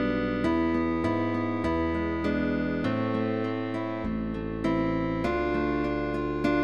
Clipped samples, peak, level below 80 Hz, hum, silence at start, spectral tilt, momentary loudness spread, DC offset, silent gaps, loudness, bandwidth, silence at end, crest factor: under 0.1%; -12 dBFS; -44 dBFS; none; 0 s; -8 dB/octave; 5 LU; 0.4%; none; -28 LUFS; 8.6 kHz; 0 s; 14 dB